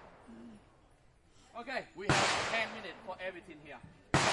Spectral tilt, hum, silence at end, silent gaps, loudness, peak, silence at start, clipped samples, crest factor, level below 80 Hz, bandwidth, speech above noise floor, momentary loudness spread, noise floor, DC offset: -3.5 dB/octave; none; 0 s; none; -34 LUFS; -12 dBFS; 0 s; under 0.1%; 24 dB; -60 dBFS; 11.5 kHz; 28 dB; 24 LU; -64 dBFS; under 0.1%